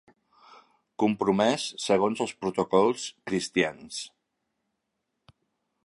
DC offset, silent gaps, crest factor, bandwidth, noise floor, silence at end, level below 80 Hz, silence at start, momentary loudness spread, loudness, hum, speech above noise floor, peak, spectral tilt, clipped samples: under 0.1%; none; 20 dB; 11.5 kHz; -81 dBFS; 1.75 s; -66 dBFS; 1 s; 14 LU; -27 LUFS; none; 55 dB; -8 dBFS; -4.5 dB/octave; under 0.1%